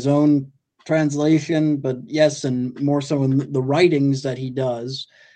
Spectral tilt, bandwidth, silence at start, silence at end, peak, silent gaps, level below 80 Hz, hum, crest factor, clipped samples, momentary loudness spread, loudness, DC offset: -6.5 dB/octave; 9 kHz; 0 s; 0.3 s; -2 dBFS; none; -64 dBFS; none; 16 dB; under 0.1%; 8 LU; -20 LUFS; under 0.1%